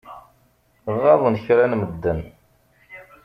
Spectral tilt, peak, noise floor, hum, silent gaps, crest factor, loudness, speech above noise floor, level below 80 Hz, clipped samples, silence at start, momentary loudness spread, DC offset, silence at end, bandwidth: -9 dB/octave; -2 dBFS; -60 dBFS; none; none; 20 dB; -19 LUFS; 42 dB; -48 dBFS; under 0.1%; 0.05 s; 15 LU; under 0.1%; 0.25 s; 5.6 kHz